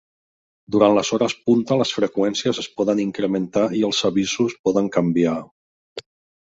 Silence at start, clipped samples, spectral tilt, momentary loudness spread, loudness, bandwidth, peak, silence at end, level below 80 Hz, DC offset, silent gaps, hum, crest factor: 0.7 s; under 0.1%; -5 dB/octave; 7 LU; -20 LUFS; 8 kHz; -2 dBFS; 0.5 s; -60 dBFS; under 0.1%; 4.59-4.64 s, 5.51-5.96 s; none; 18 dB